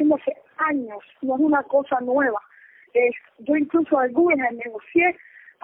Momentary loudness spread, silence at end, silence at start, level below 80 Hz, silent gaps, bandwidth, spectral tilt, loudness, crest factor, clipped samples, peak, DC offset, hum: 12 LU; 0.5 s; 0 s; -66 dBFS; none; 3.6 kHz; -9.5 dB/octave; -22 LUFS; 14 dB; under 0.1%; -8 dBFS; under 0.1%; none